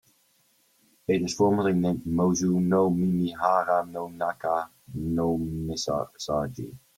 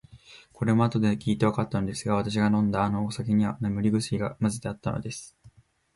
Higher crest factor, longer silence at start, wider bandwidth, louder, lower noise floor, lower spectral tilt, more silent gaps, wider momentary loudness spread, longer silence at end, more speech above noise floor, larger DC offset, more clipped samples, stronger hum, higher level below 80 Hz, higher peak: about the same, 18 dB vs 18 dB; first, 1.1 s vs 0.15 s; first, 16 kHz vs 11.5 kHz; about the same, -26 LUFS vs -27 LUFS; first, -66 dBFS vs -56 dBFS; about the same, -6 dB/octave vs -6.5 dB/octave; neither; about the same, 9 LU vs 8 LU; second, 0.2 s vs 0.45 s; first, 40 dB vs 31 dB; neither; neither; neither; about the same, -54 dBFS vs -52 dBFS; about the same, -8 dBFS vs -10 dBFS